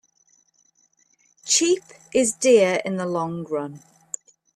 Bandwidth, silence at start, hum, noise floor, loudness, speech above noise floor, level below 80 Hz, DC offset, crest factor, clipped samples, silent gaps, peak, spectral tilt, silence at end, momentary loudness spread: 14 kHz; 1.45 s; none; -63 dBFS; -21 LUFS; 42 dB; -68 dBFS; under 0.1%; 20 dB; under 0.1%; none; -4 dBFS; -3 dB/octave; 0.8 s; 19 LU